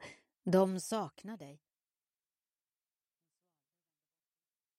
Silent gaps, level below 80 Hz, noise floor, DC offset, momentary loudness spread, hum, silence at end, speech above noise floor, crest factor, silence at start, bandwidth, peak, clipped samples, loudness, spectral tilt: none; -82 dBFS; under -90 dBFS; under 0.1%; 22 LU; none; 3.25 s; over 56 dB; 22 dB; 0 s; 16 kHz; -18 dBFS; under 0.1%; -34 LUFS; -6 dB/octave